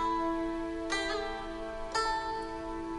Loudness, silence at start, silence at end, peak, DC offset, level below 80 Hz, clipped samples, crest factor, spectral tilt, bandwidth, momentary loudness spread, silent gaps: -34 LUFS; 0 s; 0 s; -18 dBFS; under 0.1%; -48 dBFS; under 0.1%; 16 dB; -3.5 dB/octave; 11.5 kHz; 7 LU; none